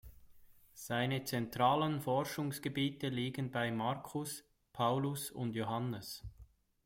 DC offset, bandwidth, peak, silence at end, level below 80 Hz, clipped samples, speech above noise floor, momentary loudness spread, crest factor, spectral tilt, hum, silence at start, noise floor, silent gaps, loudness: under 0.1%; 16.5 kHz; -18 dBFS; 0.4 s; -64 dBFS; under 0.1%; 24 dB; 12 LU; 20 dB; -5.5 dB/octave; none; 0.05 s; -61 dBFS; none; -37 LUFS